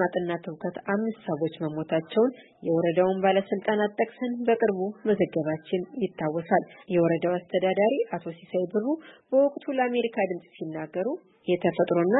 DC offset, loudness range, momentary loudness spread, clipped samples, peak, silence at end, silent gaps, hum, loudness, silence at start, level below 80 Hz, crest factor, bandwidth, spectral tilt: under 0.1%; 2 LU; 9 LU; under 0.1%; -8 dBFS; 0 s; none; none; -27 LUFS; 0 s; -72 dBFS; 18 dB; 4.1 kHz; -11 dB/octave